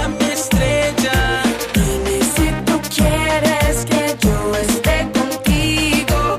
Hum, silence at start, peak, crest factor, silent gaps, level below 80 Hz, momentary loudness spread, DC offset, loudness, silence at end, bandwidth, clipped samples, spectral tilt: none; 0 s; -6 dBFS; 10 dB; none; -24 dBFS; 3 LU; under 0.1%; -16 LUFS; 0 s; 15.5 kHz; under 0.1%; -4.5 dB/octave